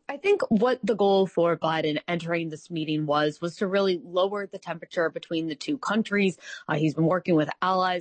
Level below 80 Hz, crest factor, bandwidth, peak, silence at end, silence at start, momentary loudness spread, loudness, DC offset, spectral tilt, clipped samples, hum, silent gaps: -70 dBFS; 14 dB; 8.8 kHz; -12 dBFS; 0 s; 0.1 s; 8 LU; -26 LUFS; under 0.1%; -6.5 dB/octave; under 0.1%; none; none